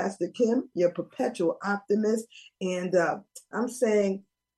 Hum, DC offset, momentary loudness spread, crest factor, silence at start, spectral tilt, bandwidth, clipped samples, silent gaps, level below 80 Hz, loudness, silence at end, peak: none; under 0.1%; 10 LU; 16 dB; 0 s; -5.5 dB/octave; 12.5 kHz; under 0.1%; none; -78 dBFS; -28 LUFS; 0.35 s; -12 dBFS